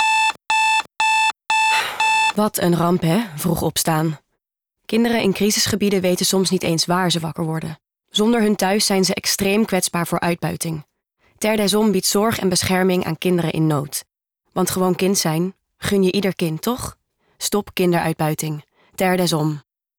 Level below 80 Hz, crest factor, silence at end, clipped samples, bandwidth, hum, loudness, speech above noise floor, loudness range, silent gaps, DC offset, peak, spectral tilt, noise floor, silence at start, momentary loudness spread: -52 dBFS; 10 dB; 0.4 s; under 0.1%; over 20 kHz; none; -19 LUFS; 59 dB; 4 LU; none; under 0.1%; -10 dBFS; -4 dB/octave; -78 dBFS; 0 s; 9 LU